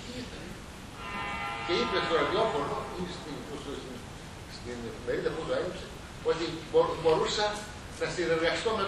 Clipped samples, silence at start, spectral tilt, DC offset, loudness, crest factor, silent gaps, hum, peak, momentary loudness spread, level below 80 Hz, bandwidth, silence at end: under 0.1%; 0 s; -4.5 dB/octave; under 0.1%; -31 LUFS; 20 dB; none; none; -12 dBFS; 15 LU; -50 dBFS; 12.5 kHz; 0 s